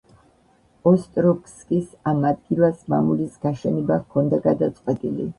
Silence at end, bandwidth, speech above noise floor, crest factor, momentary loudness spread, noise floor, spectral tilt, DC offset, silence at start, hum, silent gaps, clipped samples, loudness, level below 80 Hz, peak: 0.05 s; 11 kHz; 38 dB; 18 dB; 6 LU; -58 dBFS; -9.5 dB/octave; under 0.1%; 0.85 s; none; none; under 0.1%; -22 LUFS; -56 dBFS; -4 dBFS